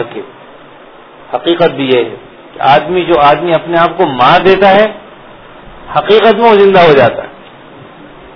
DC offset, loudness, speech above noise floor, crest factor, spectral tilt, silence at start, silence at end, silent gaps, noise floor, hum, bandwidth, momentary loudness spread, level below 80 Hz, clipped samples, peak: under 0.1%; -8 LUFS; 27 dB; 10 dB; -7 dB/octave; 0 s; 1 s; none; -35 dBFS; none; 5.4 kHz; 16 LU; -42 dBFS; 2%; 0 dBFS